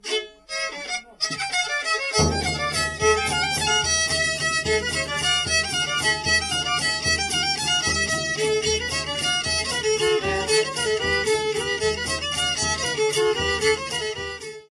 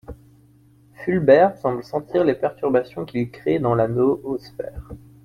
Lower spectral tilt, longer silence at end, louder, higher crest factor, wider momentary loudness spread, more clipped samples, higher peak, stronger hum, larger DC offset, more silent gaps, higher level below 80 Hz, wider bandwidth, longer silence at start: second, -1.5 dB/octave vs -9 dB/octave; about the same, 0.15 s vs 0.25 s; about the same, -22 LUFS vs -21 LUFS; about the same, 16 dB vs 18 dB; second, 7 LU vs 18 LU; neither; second, -8 dBFS vs -2 dBFS; neither; neither; neither; first, -42 dBFS vs -48 dBFS; first, 13.5 kHz vs 11.5 kHz; about the same, 0.05 s vs 0.1 s